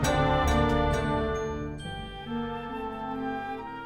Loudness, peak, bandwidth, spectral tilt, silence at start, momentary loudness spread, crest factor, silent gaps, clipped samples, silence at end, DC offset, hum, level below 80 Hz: -29 LUFS; -12 dBFS; 18 kHz; -5.5 dB/octave; 0 s; 12 LU; 16 dB; none; under 0.1%; 0 s; under 0.1%; none; -36 dBFS